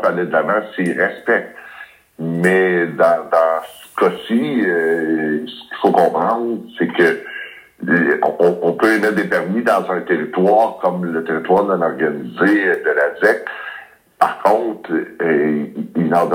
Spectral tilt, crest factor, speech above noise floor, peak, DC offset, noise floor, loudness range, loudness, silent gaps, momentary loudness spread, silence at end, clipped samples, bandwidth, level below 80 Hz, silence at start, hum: -6.5 dB/octave; 16 dB; 23 dB; 0 dBFS; under 0.1%; -39 dBFS; 2 LU; -17 LUFS; none; 10 LU; 0 s; under 0.1%; 16.5 kHz; -66 dBFS; 0 s; none